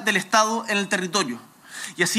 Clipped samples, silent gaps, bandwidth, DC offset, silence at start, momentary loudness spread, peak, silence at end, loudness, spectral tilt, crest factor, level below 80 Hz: under 0.1%; none; 16 kHz; under 0.1%; 0 s; 16 LU; -4 dBFS; 0 s; -22 LUFS; -2.5 dB/octave; 18 dB; -82 dBFS